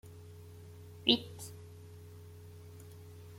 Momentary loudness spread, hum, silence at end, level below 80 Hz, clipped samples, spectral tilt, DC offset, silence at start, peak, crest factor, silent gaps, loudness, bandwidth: 23 LU; 50 Hz at -75 dBFS; 0 s; -72 dBFS; under 0.1%; -4 dB/octave; under 0.1%; 0.05 s; -10 dBFS; 30 dB; none; -32 LUFS; 16.5 kHz